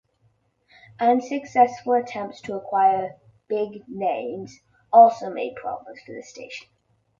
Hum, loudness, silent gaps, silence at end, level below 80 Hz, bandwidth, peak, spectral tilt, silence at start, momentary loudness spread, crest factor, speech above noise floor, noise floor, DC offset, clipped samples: none; -22 LUFS; none; 0.6 s; -68 dBFS; 7.4 kHz; -2 dBFS; -5.5 dB/octave; 1 s; 22 LU; 20 dB; 44 dB; -66 dBFS; under 0.1%; under 0.1%